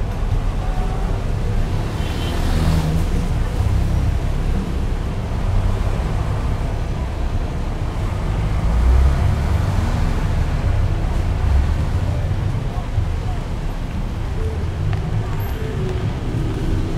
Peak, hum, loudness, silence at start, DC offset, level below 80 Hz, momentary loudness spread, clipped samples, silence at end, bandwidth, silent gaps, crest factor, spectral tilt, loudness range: -4 dBFS; none; -22 LUFS; 0 s; under 0.1%; -20 dBFS; 6 LU; under 0.1%; 0 s; 13.5 kHz; none; 14 dB; -7 dB/octave; 4 LU